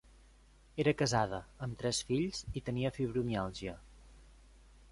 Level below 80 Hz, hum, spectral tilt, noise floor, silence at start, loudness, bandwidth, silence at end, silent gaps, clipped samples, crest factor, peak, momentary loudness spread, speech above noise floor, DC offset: -56 dBFS; none; -5 dB/octave; -62 dBFS; 0.75 s; -36 LUFS; 11.5 kHz; 0.6 s; none; under 0.1%; 22 dB; -16 dBFS; 13 LU; 27 dB; under 0.1%